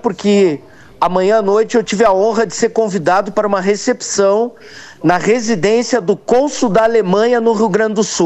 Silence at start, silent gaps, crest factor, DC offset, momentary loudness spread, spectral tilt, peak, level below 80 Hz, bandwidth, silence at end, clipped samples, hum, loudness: 0.05 s; none; 14 dB; under 0.1%; 4 LU; -4.5 dB/octave; 0 dBFS; -50 dBFS; 8.6 kHz; 0 s; under 0.1%; none; -14 LUFS